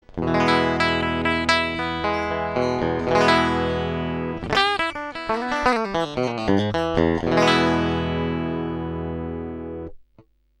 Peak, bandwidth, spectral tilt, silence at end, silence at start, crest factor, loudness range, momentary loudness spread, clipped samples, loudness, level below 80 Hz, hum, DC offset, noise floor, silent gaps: -2 dBFS; 11.5 kHz; -5.5 dB/octave; 0.65 s; 0.1 s; 20 dB; 2 LU; 11 LU; under 0.1%; -22 LUFS; -42 dBFS; none; under 0.1%; -56 dBFS; none